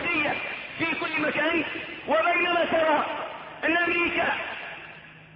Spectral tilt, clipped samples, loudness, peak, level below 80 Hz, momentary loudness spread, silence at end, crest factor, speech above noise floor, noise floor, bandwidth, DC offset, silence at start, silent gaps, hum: -7.5 dB/octave; under 0.1%; -25 LUFS; -12 dBFS; -60 dBFS; 14 LU; 0 s; 14 dB; 21 dB; -46 dBFS; 5.8 kHz; under 0.1%; 0 s; none; none